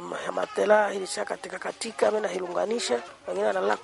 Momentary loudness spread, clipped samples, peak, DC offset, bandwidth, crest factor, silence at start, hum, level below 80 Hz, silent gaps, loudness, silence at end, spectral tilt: 11 LU; under 0.1%; -8 dBFS; under 0.1%; 11.5 kHz; 20 dB; 0 s; none; -72 dBFS; none; -27 LUFS; 0 s; -3 dB/octave